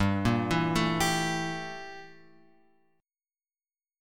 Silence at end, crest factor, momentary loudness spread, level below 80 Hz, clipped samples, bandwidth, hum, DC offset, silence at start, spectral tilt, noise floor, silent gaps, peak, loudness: 1.9 s; 18 dB; 16 LU; -50 dBFS; under 0.1%; 17.5 kHz; none; under 0.1%; 0 s; -5 dB/octave; under -90 dBFS; none; -12 dBFS; -28 LUFS